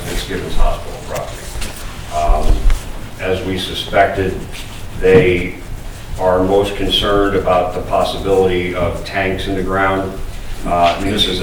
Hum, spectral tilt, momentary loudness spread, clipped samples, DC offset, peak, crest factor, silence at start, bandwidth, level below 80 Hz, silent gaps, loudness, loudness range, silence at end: none; -5 dB/octave; 14 LU; under 0.1%; 0.3%; 0 dBFS; 16 dB; 0 s; 19.5 kHz; -22 dBFS; none; -17 LUFS; 6 LU; 0 s